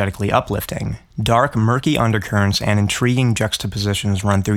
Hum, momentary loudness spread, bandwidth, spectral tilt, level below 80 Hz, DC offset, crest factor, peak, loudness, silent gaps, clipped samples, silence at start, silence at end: none; 7 LU; 16.5 kHz; -5.5 dB/octave; -40 dBFS; under 0.1%; 18 dB; 0 dBFS; -18 LUFS; none; under 0.1%; 0 s; 0 s